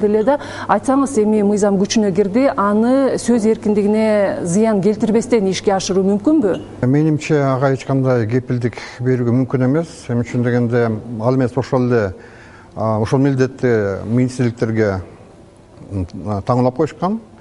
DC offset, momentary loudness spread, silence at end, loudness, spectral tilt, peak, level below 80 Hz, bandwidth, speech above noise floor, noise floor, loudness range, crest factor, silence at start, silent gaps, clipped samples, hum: under 0.1%; 7 LU; 0.15 s; -17 LUFS; -7 dB/octave; 0 dBFS; -48 dBFS; 11.5 kHz; 27 dB; -43 dBFS; 4 LU; 16 dB; 0 s; none; under 0.1%; none